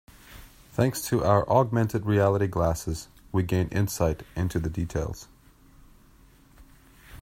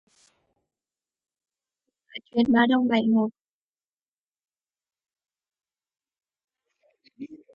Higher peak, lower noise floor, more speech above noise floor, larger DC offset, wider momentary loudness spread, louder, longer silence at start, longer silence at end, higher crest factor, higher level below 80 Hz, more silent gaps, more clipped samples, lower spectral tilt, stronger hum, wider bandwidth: about the same, -6 dBFS vs -8 dBFS; second, -55 dBFS vs under -90 dBFS; second, 30 dB vs over 68 dB; neither; second, 10 LU vs 23 LU; second, -26 LUFS vs -22 LUFS; second, 0.3 s vs 2.15 s; second, 0 s vs 0.2 s; about the same, 20 dB vs 22 dB; first, -46 dBFS vs -68 dBFS; second, none vs 3.41-3.74 s, 3.89-3.93 s, 4.02-4.32 s, 6.44-6.48 s; neither; about the same, -6.5 dB/octave vs -7 dB/octave; neither; first, 16 kHz vs 5.4 kHz